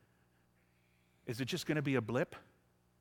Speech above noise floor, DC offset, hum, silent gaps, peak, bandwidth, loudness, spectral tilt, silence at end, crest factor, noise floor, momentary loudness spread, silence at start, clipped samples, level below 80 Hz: 36 dB; under 0.1%; 60 Hz at -60 dBFS; none; -20 dBFS; 18 kHz; -37 LUFS; -5.5 dB/octave; 0.6 s; 20 dB; -73 dBFS; 15 LU; 1.25 s; under 0.1%; -74 dBFS